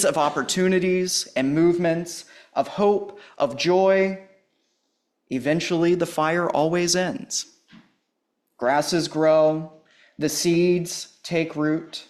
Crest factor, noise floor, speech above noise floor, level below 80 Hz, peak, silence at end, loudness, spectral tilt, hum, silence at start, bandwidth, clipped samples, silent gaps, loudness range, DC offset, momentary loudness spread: 16 dB; -75 dBFS; 54 dB; -62 dBFS; -8 dBFS; 0.05 s; -22 LUFS; -4.5 dB/octave; none; 0 s; 14 kHz; under 0.1%; none; 2 LU; under 0.1%; 11 LU